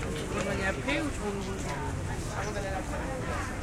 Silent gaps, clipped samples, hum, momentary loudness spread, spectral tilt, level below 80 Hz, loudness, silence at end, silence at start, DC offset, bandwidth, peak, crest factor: none; under 0.1%; none; 4 LU; -5 dB/octave; -40 dBFS; -33 LUFS; 0 s; 0 s; under 0.1%; 16.5 kHz; -14 dBFS; 18 dB